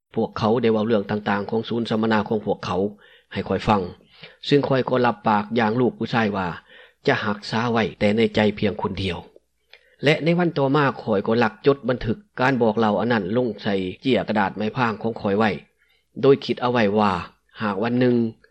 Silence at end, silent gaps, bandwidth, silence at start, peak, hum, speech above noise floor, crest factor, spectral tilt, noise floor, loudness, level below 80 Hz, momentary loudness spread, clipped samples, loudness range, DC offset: 0.2 s; none; 8.8 kHz; 0.15 s; -6 dBFS; none; 34 dB; 16 dB; -7 dB/octave; -55 dBFS; -22 LUFS; -52 dBFS; 8 LU; under 0.1%; 2 LU; under 0.1%